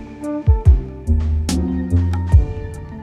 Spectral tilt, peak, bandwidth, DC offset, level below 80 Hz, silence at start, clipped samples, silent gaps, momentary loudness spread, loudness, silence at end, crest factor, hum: -7.5 dB/octave; -2 dBFS; 11.5 kHz; under 0.1%; -18 dBFS; 0 s; under 0.1%; none; 11 LU; -18 LUFS; 0 s; 16 dB; none